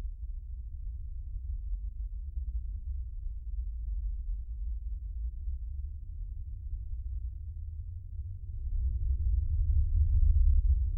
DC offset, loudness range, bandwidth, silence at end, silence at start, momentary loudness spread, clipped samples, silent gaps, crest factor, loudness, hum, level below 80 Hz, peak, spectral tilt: under 0.1%; 9 LU; 0.5 kHz; 0 s; 0 s; 14 LU; under 0.1%; none; 16 dB; -36 LUFS; none; -32 dBFS; -16 dBFS; -12.5 dB/octave